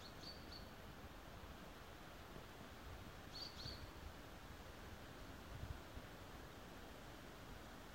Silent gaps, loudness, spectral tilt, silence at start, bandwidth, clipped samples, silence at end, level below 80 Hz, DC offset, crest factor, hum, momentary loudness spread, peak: none; -56 LUFS; -4.5 dB/octave; 0 s; 16 kHz; under 0.1%; 0 s; -62 dBFS; under 0.1%; 18 dB; none; 5 LU; -38 dBFS